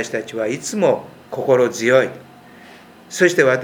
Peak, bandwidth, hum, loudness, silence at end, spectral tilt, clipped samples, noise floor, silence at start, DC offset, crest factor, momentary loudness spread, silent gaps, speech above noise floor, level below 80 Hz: 0 dBFS; 16.5 kHz; none; -18 LUFS; 0 s; -4.5 dB/octave; under 0.1%; -43 dBFS; 0 s; under 0.1%; 18 dB; 11 LU; none; 25 dB; -66 dBFS